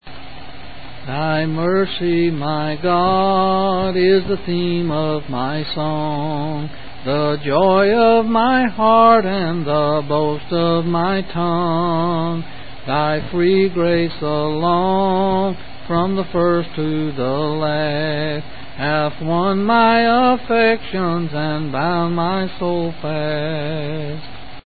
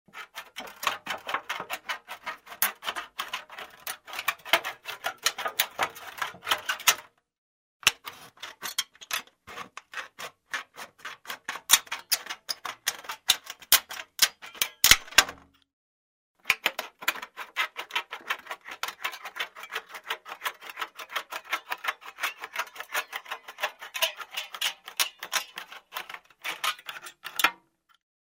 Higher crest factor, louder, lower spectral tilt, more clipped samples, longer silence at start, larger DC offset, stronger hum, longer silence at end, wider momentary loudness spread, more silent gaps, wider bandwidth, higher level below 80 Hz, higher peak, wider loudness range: second, 18 dB vs 32 dB; first, -18 LUFS vs -28 LUFS; first, -12 dB/octave vs 1.5 dB/octave; neither; second, 0 s vs 0.15 s; first, 4% vs under 0.1%; neither; second, 0 s vs 0.75 s; second, 11 LU vs 18 LU; second, none vs 7.38-7.80 s, 15.73-16.35 s; second, 4.8 kHz vs 16 kHz; first, -44 dBFS vs -58 dBFS; about the same, 0 dBFS vs 0 dBFS; second, 5 LU vs 11 LU